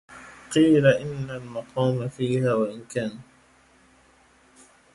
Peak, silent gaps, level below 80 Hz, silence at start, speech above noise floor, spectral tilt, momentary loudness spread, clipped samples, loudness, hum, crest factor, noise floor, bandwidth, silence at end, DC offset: -6 dBFS; none; -60 dBFS; 0.1 s; 35 dB; -6.5 dB/octave; 16 LU; under 0.1%; -24 LUFS; none; 20 dB; -58 dBFS; 11.5 kHz; 1.7 s; under 0.1%